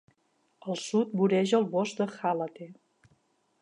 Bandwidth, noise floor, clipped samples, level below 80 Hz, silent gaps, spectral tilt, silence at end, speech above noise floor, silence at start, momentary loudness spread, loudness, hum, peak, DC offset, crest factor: 11 kHz; -72 dBFS; under 0.1%; -82 dBFS; none; -6 dB/octave; 0.9 s; 44 dB; 0.65 s; 17 LU; -29 LUFS; none; -12 dBFS; under 0.1%; 18 dB